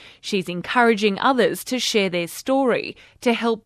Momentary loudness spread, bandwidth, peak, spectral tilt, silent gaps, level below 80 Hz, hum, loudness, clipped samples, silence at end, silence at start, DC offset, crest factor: 8 LU; 14.5 kHz; -4 dBFS; -4 dB/octave; none; -62 dBFS; none; -21 LUFS; under 0.1%; 0.05 s; 0 s; under 0.1%; 18 dB